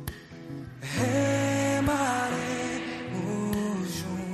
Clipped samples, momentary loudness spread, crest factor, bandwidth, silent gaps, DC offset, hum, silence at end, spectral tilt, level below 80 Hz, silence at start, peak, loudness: under 0.1%; 15 LU; 14 dB; 13 kHz; none; under 0.1%; none; 0 s; -5 dB/octave; -52 dBFS; 0 s; -14 dBFS; -28 LUFS